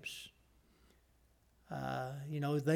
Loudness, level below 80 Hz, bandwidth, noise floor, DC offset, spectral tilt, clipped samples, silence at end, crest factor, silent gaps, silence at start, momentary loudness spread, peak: -41 LUFS; -70 dBFS; 16.5 kHz; -71 dBFS; under 0.1%; -6.5 dB/octave; under 0.1%; 0 s; 18 dB; none; 0 s; 13 LU; -22 dBFS